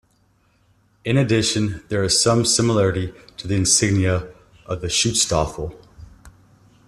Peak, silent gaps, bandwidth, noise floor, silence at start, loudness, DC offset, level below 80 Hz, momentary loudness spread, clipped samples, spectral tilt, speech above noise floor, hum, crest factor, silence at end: -2 dBFS; none; 13.5 kHz; -61 dBFS; 1.05 s; -19 LUFS; under 0.1%; -44 dBFS; 15 LU; under 0.1%; -4 dB/octave; 41 dB; none; 18 dB; 0.6 s